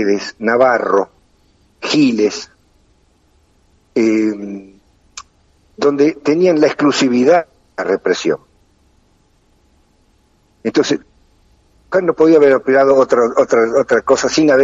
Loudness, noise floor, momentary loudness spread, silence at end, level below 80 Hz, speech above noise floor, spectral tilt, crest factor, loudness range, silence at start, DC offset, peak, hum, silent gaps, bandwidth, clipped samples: -14 LUFS; -55 dBFS; 16 LU; 0 s; -54 dBFS; 43 dB; -4.5 dB/octave; 14 dB; 9 LU; 0 s; under 0.1%; 0 dBFS; none; none; 8 kHz; under 0.1%